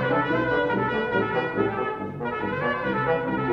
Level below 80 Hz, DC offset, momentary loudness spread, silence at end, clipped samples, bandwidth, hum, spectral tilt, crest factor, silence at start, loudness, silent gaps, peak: -52 dBFS; under 0.1%; 6 LU; 0 s; under 0.1%; 6.6 kHz; none; -8 dB/octave; 14 dB; 0 s; -25 LUFS; none; -10 dBFS